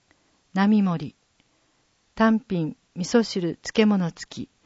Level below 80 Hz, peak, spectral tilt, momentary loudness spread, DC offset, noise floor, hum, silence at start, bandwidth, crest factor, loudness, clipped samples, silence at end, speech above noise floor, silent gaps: -60 dBFS; -6 dBFS; -6 dB/octave; 12 LU; under 0.1%; -66 dBFS; none; 0.55 s; 8 kHz; 18 dB; -23 LUFS; under 0.1%; 0.2 s; 44 dB; none